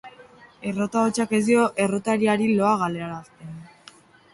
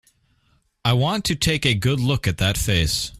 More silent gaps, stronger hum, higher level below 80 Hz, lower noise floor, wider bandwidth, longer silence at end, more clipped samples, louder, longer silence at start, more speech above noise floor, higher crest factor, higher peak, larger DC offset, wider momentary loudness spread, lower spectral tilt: neither; neither; second, -62 dBFS vs -38 dBFS; second, -51 dBFS vs -64 dBFS; second, 11.5 kHz vs 16 kHz; first, 0.65 s vs 0 s; neither; about the same, -22 LUFS vs -20 LUFS; second, 0.05 s vs 0.85 s; second, 29 dB vs 43 dB; about the same, 16 dB vs 18 dB; second, -8 dBFS vs -4 dBFS; neither; first, 20 LU vs 2 LU; about the same, -5.5 dB/octave vs -4.5 dB/octave